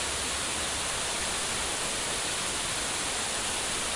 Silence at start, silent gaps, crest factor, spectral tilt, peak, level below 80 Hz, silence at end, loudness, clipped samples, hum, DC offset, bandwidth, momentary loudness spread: 0 s; none; 14 dB; -0.5 dB/octave; -16 dBFS; -50 dBFS; 0 s; -28 LUFS; under 0.1%; none; under 0.1%; 11.5 kHz; 0 LU